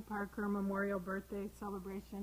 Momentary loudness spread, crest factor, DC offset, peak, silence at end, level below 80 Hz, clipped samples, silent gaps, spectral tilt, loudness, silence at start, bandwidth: 8 LU; 16 dB; under 0.1%; -26 dBFS; 0 s; -60 dBFS; under 0.1%; none; -7.5 dB/octave; -41 LUFS; 0 s; 16.5 kHz